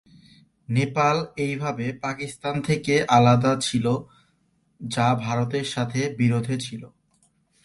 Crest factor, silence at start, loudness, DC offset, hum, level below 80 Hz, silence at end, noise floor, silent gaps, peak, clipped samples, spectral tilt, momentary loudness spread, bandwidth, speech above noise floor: 20 dB; 0.7 s; -23 LUFS; under 0.1%; none; -58 dBFS; 0.75 s; -66 dBFS; none; -4 dBFS; under 0.1%; -6 dB/octave; 12 LU; 11.5 kHz; 44 dB